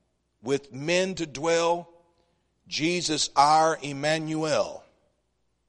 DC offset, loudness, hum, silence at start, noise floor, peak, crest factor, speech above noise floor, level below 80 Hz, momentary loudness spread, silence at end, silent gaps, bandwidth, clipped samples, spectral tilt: under 0.1%; -25 LUFS; none; 0.45 s; -74 dBFS; -6 dBFS; 22 dB; 49 dB; -62 dBFS; 11 LU; 0.9 s; none; 11 kHz; under 0.1%; -3.5 dB/octave